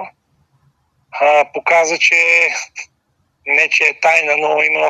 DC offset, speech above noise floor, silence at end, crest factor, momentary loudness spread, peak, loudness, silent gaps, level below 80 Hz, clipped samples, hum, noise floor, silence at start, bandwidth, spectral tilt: under 0.1%; 50 dB; 0 s; 16 dB; 19 LU; 0 dBFS; -12 LUFS; none; -70 dBFS; under 0.1%; none; -64 dBFS; 0 s; 13 kHz; -0.5 dB/octave